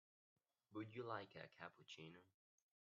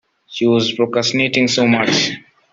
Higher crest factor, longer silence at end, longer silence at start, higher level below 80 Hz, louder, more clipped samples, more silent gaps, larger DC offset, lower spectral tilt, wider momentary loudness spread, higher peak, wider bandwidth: first, 24 dB vs 14 dB; first, 0.65 s vs 0.35 s; first, 0.7 s vs 0.3 s; second, under -90 dBFS vs -58 dBFS; second, -56 LUFS vs -15 LUFS; neither; neither; neither; about the same, -4 dB/octave vs -4 dB/octave; first, 10 LU vs 7 LU; second, -34 dBFS vs -2 dBFS; second, 7 kHz vs 7.8 kHz